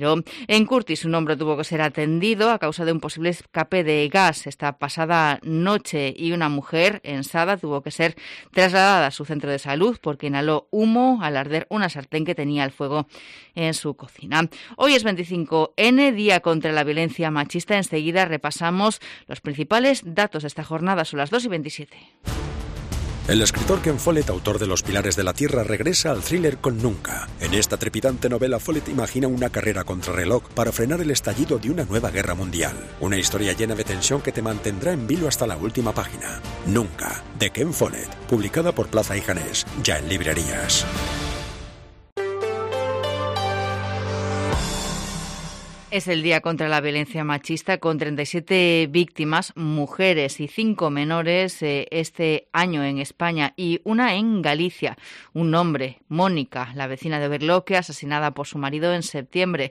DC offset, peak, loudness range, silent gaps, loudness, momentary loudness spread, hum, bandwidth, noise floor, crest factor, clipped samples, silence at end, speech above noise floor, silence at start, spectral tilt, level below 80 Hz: under 0.1%; -6 dBFS; 4 LU; 42.12-42.16 s; -22 LUFS; 10 LU; none; 15.5 kHz; -42 dBFS; 16 dB; under 0.1%; 0 s; 20 dB; 0 s; -4.5 dB/octave; -42 dBFS